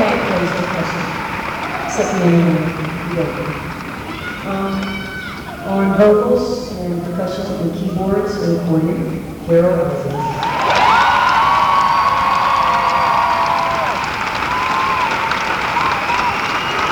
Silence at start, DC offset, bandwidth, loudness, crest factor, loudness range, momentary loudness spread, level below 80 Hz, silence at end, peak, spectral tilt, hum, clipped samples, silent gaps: 0 s; under 0.1%; 20 kHz; -16 LUFS; 14 dB; 5 LU; 10 LU; -40 dBFS; 0 s; -2 dBFS; -5.5 dB/octave; none; under 0.1%; none